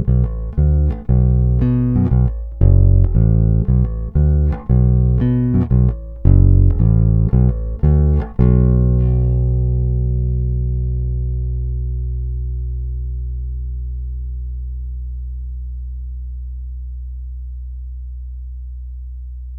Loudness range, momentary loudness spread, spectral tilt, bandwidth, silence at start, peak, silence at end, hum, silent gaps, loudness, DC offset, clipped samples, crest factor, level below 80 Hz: 15 LU; 17 LU; -13.5 dB/octave; 2.4 kHz; 0 s; 0 dBFS; 0 s; none; none; -17 LUFS; under 0.1%; under 0.1%; 14 dB; -18 dBFS